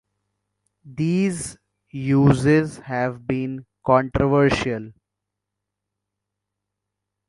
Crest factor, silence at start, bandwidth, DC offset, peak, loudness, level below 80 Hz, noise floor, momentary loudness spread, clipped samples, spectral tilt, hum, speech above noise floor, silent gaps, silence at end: 22 dB; 0.85 s; 11.5 kHz; under 0.1%; 0 dBFS; -21 LUFS; -46 dBFS; -83 dBFS; 14 LU; under 0.1%; -7 dB/octave; 50 Hz at -55 dBFS; 63 dB; none; 2.35 s